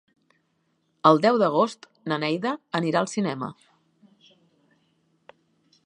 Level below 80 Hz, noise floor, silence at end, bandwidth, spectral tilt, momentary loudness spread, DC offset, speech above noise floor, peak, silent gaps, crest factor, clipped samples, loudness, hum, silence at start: -76 dBFS; -71 dBFS; 2.35 s; 10.5 kHz; -5.5 dB/octave; 13 LU; under 0.1%; 48 dB; -2 dBFS; none; 24 dB; under 0.1%; -23 LUFS; none; 1.05 s